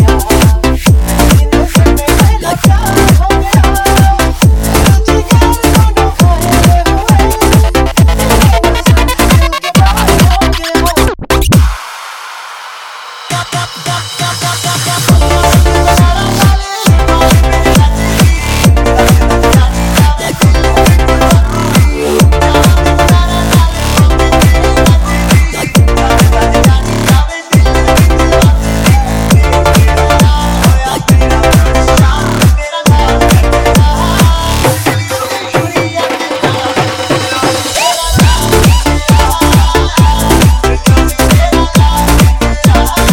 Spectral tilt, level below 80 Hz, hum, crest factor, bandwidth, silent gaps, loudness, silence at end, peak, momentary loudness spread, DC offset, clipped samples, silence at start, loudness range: -5 dB/octave; -12 dBFS; none; 8 dB; 18 kHz; none; -8 LUFS; 0 s; 0 dBFS; 5 LU; under 0.1%; 0.6%; 0 s; 3 LU